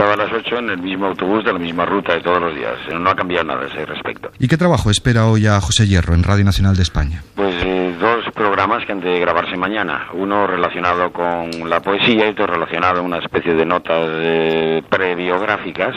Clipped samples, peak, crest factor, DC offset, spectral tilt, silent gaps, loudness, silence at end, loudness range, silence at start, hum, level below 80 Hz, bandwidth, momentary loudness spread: under 0.1%; 0 dBFS; 16 dB; under 0.1%; -5.5 dB/octave; none; -17 LUFS; 0 s; 3 LU; 0 s; none; -32 dBFS; 13.5 kHz; 7 LU